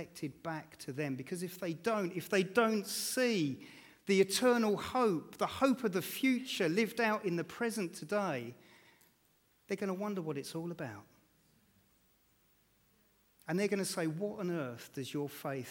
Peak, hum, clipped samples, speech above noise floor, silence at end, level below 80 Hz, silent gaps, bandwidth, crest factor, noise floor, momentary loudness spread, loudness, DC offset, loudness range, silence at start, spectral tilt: -16 dBFS; none; under 0.1%; 37 dB; 0 s; -76 dBFS; none; 19 kHz; 20 dB; -72 dBFS; 12 LU; -35 LUFS; under 0.1%; 11 LU; 0 s; -4.5 dB/octave